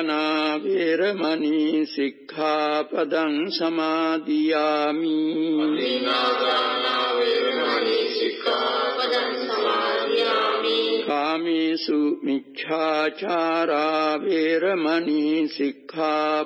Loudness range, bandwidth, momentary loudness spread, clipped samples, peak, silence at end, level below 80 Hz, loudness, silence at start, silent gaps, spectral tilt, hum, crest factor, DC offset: 1 LU; 7.6 kHz; 3 LU; under 0.1%; -10 dBFS; 0 s; under -90 dBFS; -23 LUFS; 0 s; none; -5 dB/octave; none; 14 dB; under 0.1%